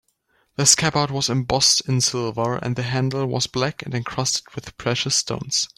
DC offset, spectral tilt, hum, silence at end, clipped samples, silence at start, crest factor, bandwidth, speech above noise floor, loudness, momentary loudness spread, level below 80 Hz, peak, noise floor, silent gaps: under 0.1%; -3 dB/octave; none; 0.1 s; under 0.1%; 0.6 s; 22 dB; 16 kHz; 44 dB; -20 LUFS; 10 LU; -52 dBFS; 0 dBFS; -66 dBFS; none